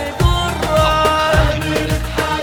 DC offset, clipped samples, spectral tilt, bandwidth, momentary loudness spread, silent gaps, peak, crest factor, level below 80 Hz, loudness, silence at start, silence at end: under 0.1%; under 0.1%; -5 dB/octave; 19 kHz; 5 LU; none; -2 dBFS; 14 dB; -22 dBFS; -16 LUFS; 0 s; 0 s